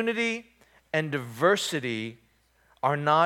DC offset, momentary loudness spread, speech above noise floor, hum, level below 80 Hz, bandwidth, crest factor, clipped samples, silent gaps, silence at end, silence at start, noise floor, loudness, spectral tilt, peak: under 0.1%; 10 LU; 39 dB; none; -72 dBFS; 17.5 kHz; 20 dB; under 0.1%; none; 0 s; 0 s; -65 dBFS; -27 LUFS; -4.5 dB/octave; -8 dBFS